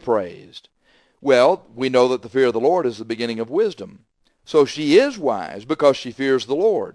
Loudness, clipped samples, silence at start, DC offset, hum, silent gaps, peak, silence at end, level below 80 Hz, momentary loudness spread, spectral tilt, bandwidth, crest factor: -19 LUFS; under 0.1%; 0.05 s; under 0.1%; none; none; -2 dBFS; 0.05 s; -62 dBFS; 11 LU; -5 dB/octave; 10.5 kHz; 18 dB